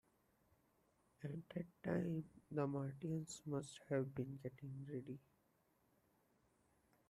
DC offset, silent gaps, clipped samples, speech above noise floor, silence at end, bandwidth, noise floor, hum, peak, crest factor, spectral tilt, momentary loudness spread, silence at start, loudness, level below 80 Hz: under 0.1%; none; under 0.1%; 34 dB; 1.9 s; 14 kHz; -80 dBFS; none; -28 dBFS; 20 dB; -7 dB/octave; 9 LU; 1.2 s; -47 LUFS; -78 dBFS